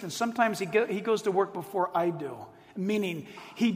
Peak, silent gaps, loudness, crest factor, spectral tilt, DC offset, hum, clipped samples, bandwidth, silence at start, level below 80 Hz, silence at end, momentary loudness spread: -10 dBFS; none; -29 LUFS; 20 dB; -5 dB/octave; under 0.1%; none; under 0.1%; 16 kHz; 0 s; -74 dBFS; 0 s; 13 LU